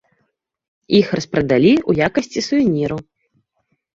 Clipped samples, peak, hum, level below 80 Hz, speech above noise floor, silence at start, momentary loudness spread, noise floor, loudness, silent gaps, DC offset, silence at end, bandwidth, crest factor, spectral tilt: under 0.1%; -2 dBFS; none; -48 dBFS; 53 dB; 0.9 s; 8 LU; -69 dBFS; -17 LUFS; none; under 0.1%; 0.95 s; 7.8 kHz; 16 dB; -6 dB/octave